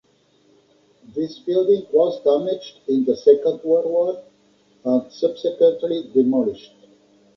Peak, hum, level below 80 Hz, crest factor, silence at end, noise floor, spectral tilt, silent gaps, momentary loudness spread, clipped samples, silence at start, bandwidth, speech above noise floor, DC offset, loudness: -2 dBFS; 50 Hz at -60 dBFS; -68 dBFS; 18 dB; 0.8 s; -59 dBFS; -7.5 dB/octave; none; 11 LU; under 0.1%; 1.15 s; 6 kHz; 40 dB; under 0.1%; -20 LUFS